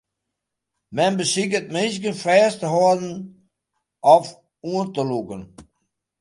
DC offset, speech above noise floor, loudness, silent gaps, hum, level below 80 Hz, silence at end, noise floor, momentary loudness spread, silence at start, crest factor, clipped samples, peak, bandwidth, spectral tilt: under 0.1%; 61 dB; -20 LUFS; none; none; -64 dBFS; 0.6 s; -81 dBFS; 20 LU; 0.9 s; 22 dB; under 0.1%; 0 dBFS; 11.5 kHz; -4.5 dB/octave